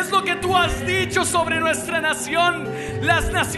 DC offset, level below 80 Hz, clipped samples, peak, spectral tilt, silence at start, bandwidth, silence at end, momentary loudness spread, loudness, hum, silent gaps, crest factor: under 0.1%; -36 dBFS; under 0.1%; -4 dBFS; -3.5 dB/octave; 0 s; 12.5 kHz; 0 s; 2 LU; -20 LUFS; none; none; 18 dB